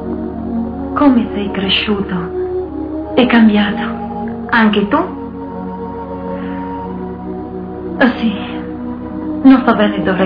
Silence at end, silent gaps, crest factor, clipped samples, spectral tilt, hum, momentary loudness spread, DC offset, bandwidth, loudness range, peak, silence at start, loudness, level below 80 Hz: 0 s; none; 16 dB; under 0.1%; -9 dB/octave; none; 15 LU; under 0.1%; 5.2 kHz; 6 LU; 0 dBFS; 0 s; -15 LUFS; -36 dBFS